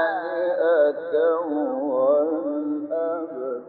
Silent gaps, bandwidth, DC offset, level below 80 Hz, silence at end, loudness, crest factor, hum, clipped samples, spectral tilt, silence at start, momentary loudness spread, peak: none; 4.4 kHz; under 0.1%; -80 dBFS; 0 s; -23 LUFS; 14 dB; none; under 0.1%; -9.5 dB/octave; 0 s; 7 LU; -10 dBFS